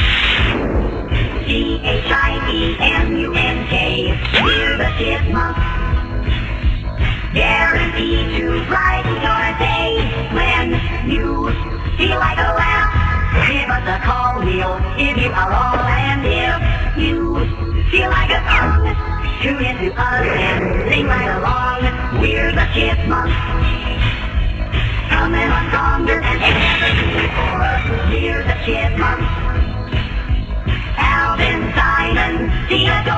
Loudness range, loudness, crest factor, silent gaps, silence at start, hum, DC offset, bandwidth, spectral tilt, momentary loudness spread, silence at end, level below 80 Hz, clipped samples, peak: 2 LU; -16 LUFS; 16 dB; none; 0 s; none; under 0.1%; 8 kHz; -6.5 dB/octave; 6 LU; 0 s; -20 dBFS; under 0.1%; 0 dBFS